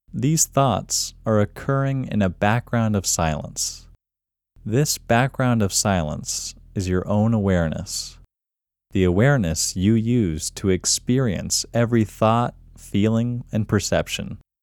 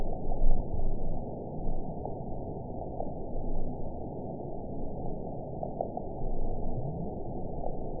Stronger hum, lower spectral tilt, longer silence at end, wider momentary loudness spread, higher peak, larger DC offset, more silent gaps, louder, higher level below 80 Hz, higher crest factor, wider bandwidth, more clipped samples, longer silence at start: neither; second, -4.5 dB/octave vs -15.5 dB/octave; first, 0.25 s vs 0 s; first, 9 LU vs 4 LU; first, -4 dBFS vs -10 dBFS; second, under 0.1% vs 0.5%; neither; first, -21 LUFS vs -38 LUFS; second, -42 dBFS vs -32 dBFS; about the same, 18 dB vs 18 dB; first, 18.5 kHz vs 1 kHz; neither; first, 0.15 s vs 0 s